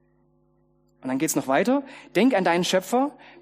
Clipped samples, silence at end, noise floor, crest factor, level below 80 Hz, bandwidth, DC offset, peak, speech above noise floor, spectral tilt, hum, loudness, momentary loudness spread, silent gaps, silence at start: under 0.1%; 0.3 s; -64 dBFS; 18 dB; -70 dBFS; 15.5 kHz; under 0.1%; -6 dBFS; 41 dB; -4 dB/octave; none; -23 LUFS; 9 LU; none; 1.05 s